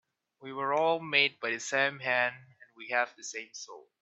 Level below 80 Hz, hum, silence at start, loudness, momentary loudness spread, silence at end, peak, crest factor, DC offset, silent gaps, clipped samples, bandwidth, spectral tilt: -86 dBFS; none; 0.4 s; -29 LUFS; 18 LU; 0.25 s; -10 dBFS; 24 dB; under 0.1%; none; under 0.1%; 8.4 kHz; -2 dB/octave